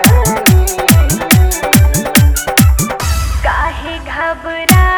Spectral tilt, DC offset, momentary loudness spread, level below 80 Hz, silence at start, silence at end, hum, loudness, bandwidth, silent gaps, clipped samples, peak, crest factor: -4.5 dB/octave; under 0.1%; 8 LU; -16 dBFS; 0 s; 0 s; none; -11 LUFS; over 20 kHz; none; 0.5%; 0 dBFS; 10 dB